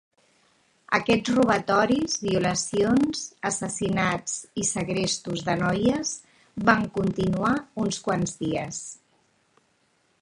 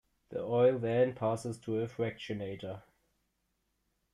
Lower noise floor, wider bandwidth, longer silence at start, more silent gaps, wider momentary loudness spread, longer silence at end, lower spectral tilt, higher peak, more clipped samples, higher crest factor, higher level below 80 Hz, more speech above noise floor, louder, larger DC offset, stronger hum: second, -67 dBFS vs -80 dBFS; about the same, 11.5 kHz vs 11.5 kHz; first, 0.9 s vs 0.3 s; neither; second, 8 LU vs 15 LU; about the same, 1.25 s vs 1.35 s; second, -4.5 dB/octave vs -7 dB/octave; first, -2 dBFS vs -16 dBFS; neither; first, 24 dB vs 18 dB; first, -54 dBFS vs -70 dBFS; second, 43 dB vs 48 dB; first, -25 LUFS vs -33 LUFS; neither; neither